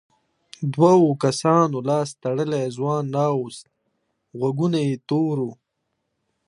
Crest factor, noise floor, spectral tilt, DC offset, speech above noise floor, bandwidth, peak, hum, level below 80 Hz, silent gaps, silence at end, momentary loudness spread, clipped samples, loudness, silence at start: 18 dB; -76 dBFS; -7 dB/octave; under 0.1%; 56 dB; 11.5 kHz; -4 dBFS; none; -70 dBFS; none; 0.95 s; 13 LU; under 0.1%; -21 LUFS; 0.6 s